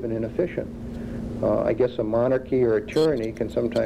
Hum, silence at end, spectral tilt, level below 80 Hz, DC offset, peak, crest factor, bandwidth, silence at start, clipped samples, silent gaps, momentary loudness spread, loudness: none; 0 s; -7.5 dB/octave; -44 dBFS; under 0.1%; -10 dBFS; 14 dB; 12.5 kHz; 0 s; under 0.1%; none; 11 LU; -24 LUFS